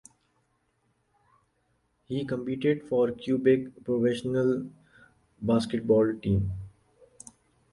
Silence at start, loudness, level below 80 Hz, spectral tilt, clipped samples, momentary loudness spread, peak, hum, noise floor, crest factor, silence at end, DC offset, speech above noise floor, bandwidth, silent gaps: 2.1 s; -27 LUFS; -52 dBFS; -7.5 dB/octave; under 0.1%; 14 LU; -10 dBFS; none; -72 dBFS; 18 dB; 1.05 s; under 0.1%; 46 dB; 11.5 kHz; none